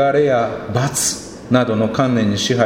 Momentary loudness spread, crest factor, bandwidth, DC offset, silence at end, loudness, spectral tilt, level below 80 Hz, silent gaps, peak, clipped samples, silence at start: 5 LU; 16 dB; 16.5 kHz; under 0.1%; 0 s; -17 LUFS; -4.5 dB/octave; -48 dBFS; none; 0 dBFS; under 0.1%; 0 s